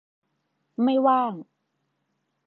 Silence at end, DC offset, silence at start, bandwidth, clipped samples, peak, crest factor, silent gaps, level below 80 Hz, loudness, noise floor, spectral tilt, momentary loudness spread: 1.05 s; under 0.1%; 0.8 s; 4.3 kHz; under 0.1%; -8 dBFS; 18 dB; none; -86 dBFS; -23 LUFS; -76 dBFS; -9.5 dB/octave; 19 LU